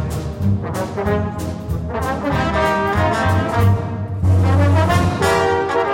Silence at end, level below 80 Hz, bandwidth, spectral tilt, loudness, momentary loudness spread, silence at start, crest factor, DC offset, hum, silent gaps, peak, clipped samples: 0 s; -32 dBFS; 16 kHz; -6.5 dB/octave; -18 LUFS; 9 LU; 0 s; 16 dB; under 0.1%; none; none; -2 dBFS; under 0.1%